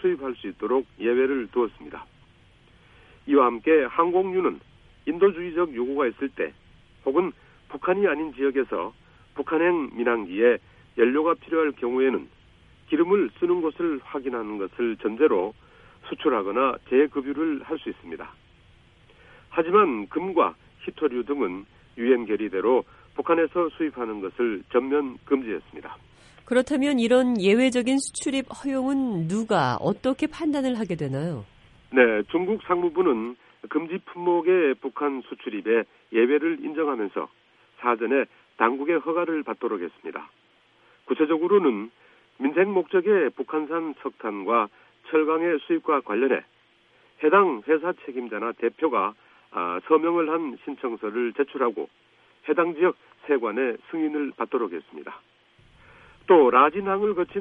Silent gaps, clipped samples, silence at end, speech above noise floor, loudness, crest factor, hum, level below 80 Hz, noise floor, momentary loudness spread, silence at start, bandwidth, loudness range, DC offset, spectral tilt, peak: none; under 0.1%; 0 s; 37 dB; -24 LUFS; 22 dB; none; -62 dBFS; -61 dBFS; 13 LU; 0 s; 11 kHz; 3 LU; under 0.1%; -6 dB/octave; -4 dBFS